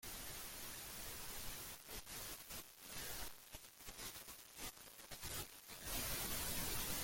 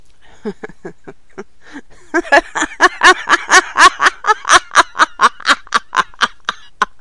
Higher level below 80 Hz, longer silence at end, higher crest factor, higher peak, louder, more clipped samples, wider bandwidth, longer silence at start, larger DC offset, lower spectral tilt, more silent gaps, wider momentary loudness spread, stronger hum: second, -60 dBFS vs -46 dBFS; second, 0 s vs 0.15 s; first, 20 dB vs 14 dB; second, -28 dBFS vs 0 dBFS; second, -47 LUFS vs -12 LUFS; second, under 0.1% vs 0.4%; first, 17 kHz vs 12 kHz; second, 0 s vs 0.45 s; second, under 0.1% vs 2%; about the same, -1.5 dB/octave vs -0.5 dB/octave; neither; second, 12 LU vs 18 LU; neither